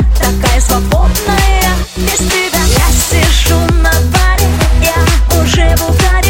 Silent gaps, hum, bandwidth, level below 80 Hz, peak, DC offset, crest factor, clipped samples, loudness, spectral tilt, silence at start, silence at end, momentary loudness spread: none; none; 17.5 kHz; -12 dBFS; 0 dBFS; under 0.1%; 8 dB; under 0.1%; -10 LUFS; -4 dB/octave; 0 s; 0 s; 2 LU